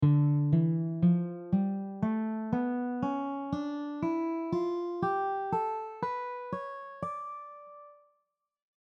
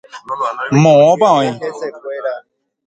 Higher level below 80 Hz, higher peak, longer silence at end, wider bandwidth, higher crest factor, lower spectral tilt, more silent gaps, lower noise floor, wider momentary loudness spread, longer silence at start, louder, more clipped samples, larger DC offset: second, -66 dBFS vs -56 dBFS; second, -16 dBFS vs 0 dBFS; first, 1.05 s vs 0.5 s; second, 6.2 kHz vs 9 kHz; about the same, 16 dB vs 14 dB; first, -10 dB/octave vs -6.5 dB/octave; neither; first, -80 dBFS vs -38 dBFS; second, 12 LU vs 17 LU; second, 0 s vs 0.15 s; second, -32 LUFS vs -13 LUFS; neither; neither